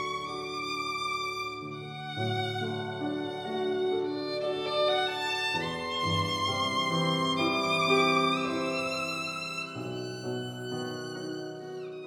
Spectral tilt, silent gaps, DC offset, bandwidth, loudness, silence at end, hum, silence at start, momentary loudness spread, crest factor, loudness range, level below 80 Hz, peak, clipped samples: -4.5 dB/octave; none; under 0.1%; 17.5 kHz; -30 LUFS; 0 s; none; 0 s; 10 LU; 18 dB; 6 LU; -68 dBFS; -12 dBFS; under 0.1%